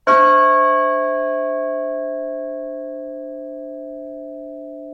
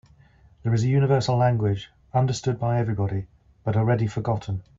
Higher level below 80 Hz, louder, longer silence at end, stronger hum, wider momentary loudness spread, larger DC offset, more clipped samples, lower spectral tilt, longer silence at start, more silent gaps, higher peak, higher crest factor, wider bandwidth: second, -62 dBFS vs -52 dBFS; first, -17 LUFS vs -24 LUFS; second, 0 s vs 0.2 s; neither; first, 20 LU vs 11 LU; neither; neither; second, -4.5 dB/octave vs -7 dB/octave; second, 0.05 s vs 0.65 s; neither; first, -2 dBFS vs -8 dBFS; about the same, 16 dB vs 16 dB; about the same, 7.2 kHz vs 7.6 kHz